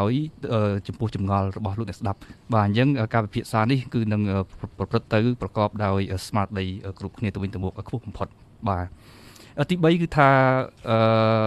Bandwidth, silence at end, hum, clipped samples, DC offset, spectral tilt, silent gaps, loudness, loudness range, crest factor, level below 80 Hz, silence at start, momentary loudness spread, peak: 12.5 kHz; 0 s; none; under 0.1%; under 0.1%; -7.5 dB/octave; none; -24 LUFS; 6 LU; 20 dB; -50 dBFS; 0 s; 14 LU; -4 dBFS